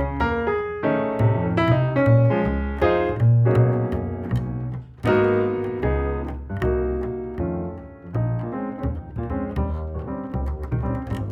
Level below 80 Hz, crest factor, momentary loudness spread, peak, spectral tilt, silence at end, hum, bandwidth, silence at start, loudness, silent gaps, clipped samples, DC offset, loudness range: -34 dBFS; 18 dB; 12 LU; -4 dBFS; -9.5 dB/octave; 0 s; none; 5.2 kHz; 0 s; -23 LUFS; none; under 0.1%; under 0.1%; 8 LU